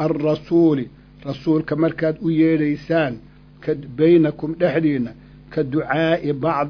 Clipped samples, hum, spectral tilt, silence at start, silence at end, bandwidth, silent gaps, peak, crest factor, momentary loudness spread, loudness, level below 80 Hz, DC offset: under 0.1%; none; -9 dB/octave; 0 s; 0 s; 5.4 kHz; none; -4 dBFS; 14 dB; 13 LU; -20 LUFS; -50 dBFS; under 0.1%